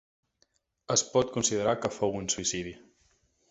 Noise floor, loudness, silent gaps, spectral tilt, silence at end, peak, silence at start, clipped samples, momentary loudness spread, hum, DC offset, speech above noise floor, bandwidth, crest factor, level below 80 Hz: -72 dBFS; -28 LUFS; none; -3 dB/octave; 0.75 s; -10 dBFS; 0.9 s; under 0.1%; 6 LU; none; under 0.1%; 43 dB; 8.2 kHz; 20 dB; -60 dBFS